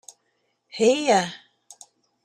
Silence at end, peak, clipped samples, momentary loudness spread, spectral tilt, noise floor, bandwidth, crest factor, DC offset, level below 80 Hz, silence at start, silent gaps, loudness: 0.9 s; -6 dBFS; under 0.1%; 21 LU; -3.5 dB/octave; -72 dBFS; 13.5 kHz; 18 dB; under 0.1%; -74 dBFS; 0.75 s; none; -21 LUFS